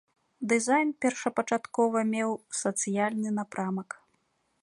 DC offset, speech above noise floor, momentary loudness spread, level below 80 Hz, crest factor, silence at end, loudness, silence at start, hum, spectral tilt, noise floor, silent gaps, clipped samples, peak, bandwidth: under 0.1%; 45 dB; 9 LU; -78 dBFS; 18 dB; 0.8 s; -29 LUFS; 0.4 s; none; -4.5 dB/octave; -73 dBFS; none; under 0.1%; -10 dBFS; 11.5 kHz